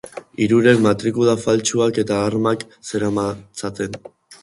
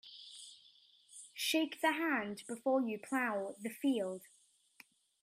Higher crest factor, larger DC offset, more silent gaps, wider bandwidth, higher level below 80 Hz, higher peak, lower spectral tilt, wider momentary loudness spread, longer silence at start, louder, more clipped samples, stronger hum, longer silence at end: about the same, 18 dB vs 20 dB; neither; neither; second, 11.5 kHz vs 16 kHz; first, -52 dBFS vs -86 dBFS; first, 0 dBFS vs -20 dBFS; first, -5 dB/octave vs -3 dB/octave; second, 14 LU vs 17 LU; about the same, 0.05 s vs 0.05 s; first, -19 LUFS vs -36 LUFS; neither; neither; second, 0.1 s vs 1 s